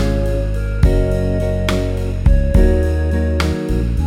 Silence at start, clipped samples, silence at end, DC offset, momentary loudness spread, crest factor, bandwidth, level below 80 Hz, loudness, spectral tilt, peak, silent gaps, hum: 0 s; under 0.1%; 0 s; under 0.1%; 5 LU; 14 dB; 12.5 kHz; -16 dBFS; -17 LUFS; -7.5 dB/octave; 0 dBFS; none; none